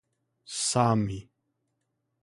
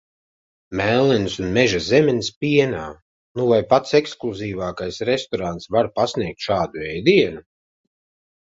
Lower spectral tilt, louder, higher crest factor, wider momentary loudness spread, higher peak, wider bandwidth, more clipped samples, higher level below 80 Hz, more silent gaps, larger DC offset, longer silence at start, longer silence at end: about the same, -4.5 dB/octave vs -5.5 dB/octave; second, -27 LUFS vs -20 LUFS; about the same, 22 dB vs 20 dB; first, 14 LU vs 11 LU; second, -10 dBFS vs -2 dBFS; first, 11.5 kHz vs 7.8 kHz; neither; second, -58 dBFS vs -48 dBFS; second, none vs 2.36-2.41 s, 3.02-3.35 s; neither; second, 0.5 s vs 0.7 s; second, 1 s vs 1.15 s